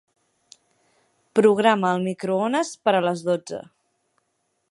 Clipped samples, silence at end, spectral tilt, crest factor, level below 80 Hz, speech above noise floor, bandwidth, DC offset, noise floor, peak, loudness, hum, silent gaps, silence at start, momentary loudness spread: under 0.1%; 1.1 s; -5.5 dB/octave; 22 dB; -74 dBFS; 52 dB; 11.5 kHz; under 0.1%; -73 dBFS; -2 dBFS; -21 LUFS; none; none; 1.35 s; 9 LU